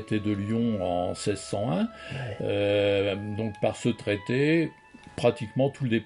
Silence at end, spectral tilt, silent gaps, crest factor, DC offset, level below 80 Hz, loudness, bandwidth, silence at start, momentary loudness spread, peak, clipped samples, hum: 0 s; -6.5 dB/octave; none; 18 dB; under 0.1%; -60 dBFS; -28 LUFS; 11 kHz; 0 s; 8 LU; -8 dBFS; under 0.1%; none